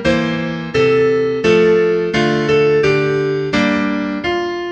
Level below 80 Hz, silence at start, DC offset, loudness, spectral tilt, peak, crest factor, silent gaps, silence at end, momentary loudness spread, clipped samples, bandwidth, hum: -42 dBFS; 0 s; under 0.1%; -15 LUFS; -6 dB/octave; -2 dBFS; 14 dB; none; 0 s; 6 LU; under 0.1%; 8.4 kHz; none